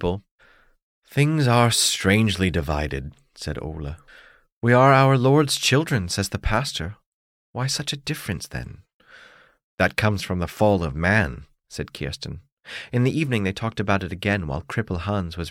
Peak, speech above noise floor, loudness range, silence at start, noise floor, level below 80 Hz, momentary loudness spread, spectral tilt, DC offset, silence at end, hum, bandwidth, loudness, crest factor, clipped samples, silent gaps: -4 dBFS; 29 dB; 7 LU; 0 s; -51 dBFS; -40 dBFS; 18 LU; -5 dB/octave; under 0.1%; 0 s; none; 16.5 kHz; -22 LUFS; 20 dB; under 0.1%; 0.31-0.38 s, 0.83-1.02 s, 4.52-4.61 s, 7.06-7.54 s, 8.93-9.00 s, 9.63-9.78 s, 12.52-12.57 s